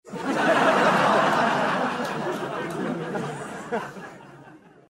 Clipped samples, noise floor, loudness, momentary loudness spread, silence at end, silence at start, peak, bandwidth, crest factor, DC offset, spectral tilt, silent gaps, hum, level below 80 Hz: under 0.1%; -49 dBFS; -23 LUFS; 14 LU; 0.3 s; 0.05 s; -8 dBFS; 16 kHz; 16 dB; under 0.1%; -5 dB/octave; none; none; -64 dBFS